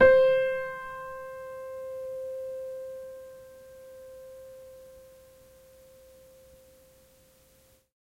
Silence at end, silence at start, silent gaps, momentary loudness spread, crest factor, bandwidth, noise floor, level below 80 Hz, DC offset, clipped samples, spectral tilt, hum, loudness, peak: 2.95 s; 0 s; none; 24 LU; 24 dB; 15.5 kHz; -62 dBFS; -62 dBFS; under 0.1%; under 0.1%; -5 dB/octave; none; -30 LUFS; -8 dBFS